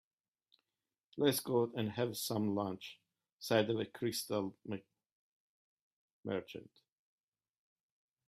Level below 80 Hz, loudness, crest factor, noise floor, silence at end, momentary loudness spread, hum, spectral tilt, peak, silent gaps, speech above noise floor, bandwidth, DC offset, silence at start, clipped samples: -80 dBFS; -37 LUFS; 24 dB; under -90 dBFS; 1.65 s; 16 LU; none; -5 dB/octave; -16 dBFS; 3.32-3.38 s, 5.12-6.23 s; over 53 dB; 15.5 kHz; under 0.1%; 1.15 s; under 0.1%